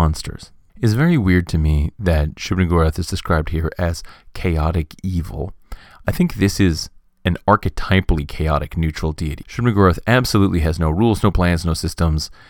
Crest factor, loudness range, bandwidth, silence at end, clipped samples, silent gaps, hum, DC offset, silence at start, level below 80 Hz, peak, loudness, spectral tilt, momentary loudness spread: 18 dB; 4 LU; 18 kHz; 0.15 s; under 0.1%; none; none; under 0.1%; 0 s; -26 dBFS; 0 dBFS; -19 LUFS; -6.5 dB/octave; 10 LU